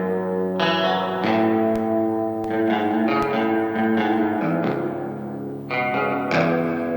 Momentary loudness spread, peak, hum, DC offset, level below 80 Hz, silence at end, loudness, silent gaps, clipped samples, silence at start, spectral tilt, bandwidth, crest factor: 6 LU; -6 dBFS; 50 Hz at -45 dBFS; under 0.1%; -58 dBFS; 0 s; -22 LUFS; none; under 0.1%; 0 s; -7 dB/octave; 19 kHz; 16 dB